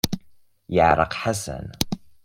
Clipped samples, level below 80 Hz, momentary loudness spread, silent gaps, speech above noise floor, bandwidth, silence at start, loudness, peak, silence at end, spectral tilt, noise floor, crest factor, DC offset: under 0.1%; -44 dBFS; 12 LU; none; 33 dB; 16.5 kHz; 0.05 s; -23 LUFS; 0 dBFS; 0.15 s; -4.5 dB/octave; -55 dBFS; 22 dB; under 0.1%